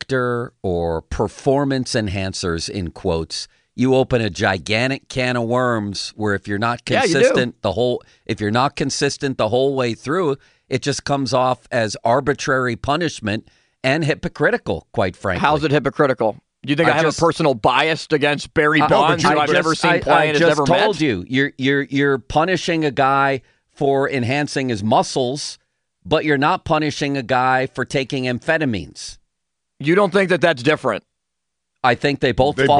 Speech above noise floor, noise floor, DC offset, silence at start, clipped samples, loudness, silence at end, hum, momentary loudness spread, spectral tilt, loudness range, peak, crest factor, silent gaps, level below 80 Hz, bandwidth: 61 dB; -80 dBFS; under 0.1%; 0.1 s; under 0.1%; -18 LUFS; 0 s; none; 8 LU; -5 dB/octave; 5 LU; -2 dBFS; 16 dB; none; -44 dBFS; 10.5 kHz